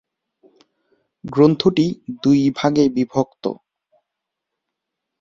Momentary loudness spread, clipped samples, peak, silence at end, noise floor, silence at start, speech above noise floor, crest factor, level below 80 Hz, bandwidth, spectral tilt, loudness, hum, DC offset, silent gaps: 13 LU; under 0.1%; -2 dBFS; 1.65 s; -81 dBFS; 1.25 s; 64 dB; 20 dB; -58 dBFS; 7.4 kHz; -7 dB/octave; -18 LUFS; none; under 0.1%; none